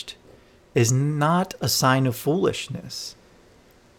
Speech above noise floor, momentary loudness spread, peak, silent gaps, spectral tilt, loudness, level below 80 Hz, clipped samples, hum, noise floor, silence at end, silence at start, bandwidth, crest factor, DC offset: 32 dB; 14 LU; -6 dBFS; none; -5 dB/octave; -23 LUFS; -58 dBFS; under 0.1%; none; -54 dBFS; 0.85 s; 0 s; 18 kHz; 18 dB; under 0.1%